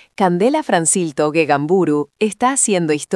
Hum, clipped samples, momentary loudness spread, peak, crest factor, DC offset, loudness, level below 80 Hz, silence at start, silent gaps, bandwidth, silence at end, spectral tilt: none; under 0.1%; 4 LU; 0 dBFS; 16 dB; under 0.1%; -16 LUFS; -64 dBFS; 0.2 s; none; 12 kHz; 0 s; -4 dB/octave